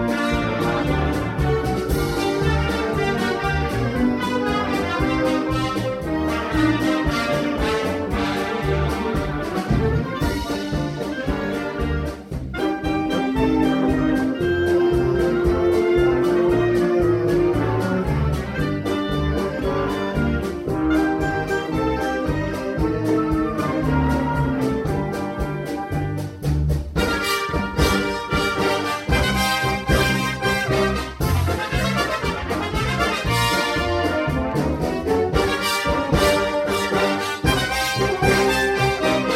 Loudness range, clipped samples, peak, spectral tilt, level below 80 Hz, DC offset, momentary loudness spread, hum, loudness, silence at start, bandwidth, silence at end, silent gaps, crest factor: 4 LU; under 0.1%; -4 dBFS; -5.5 dB/octave; -32 dBFS; under 0.1%; 6 LU; none; -21 LUFS; 0 s; 16.5 kHz; 0 s; none; 16 dB